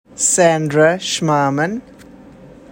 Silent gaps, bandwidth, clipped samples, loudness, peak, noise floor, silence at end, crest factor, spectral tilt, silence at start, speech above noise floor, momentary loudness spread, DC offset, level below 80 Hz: none; 16.5 kHz; under 0.1%; -15 LUFS; 0 dBFS; -40 dBFS; 0.25 s; 16 dB; -3.5 dB/octave; 0.15 s; 25 dB; 8 LU; under 0.1%; -54 dBFS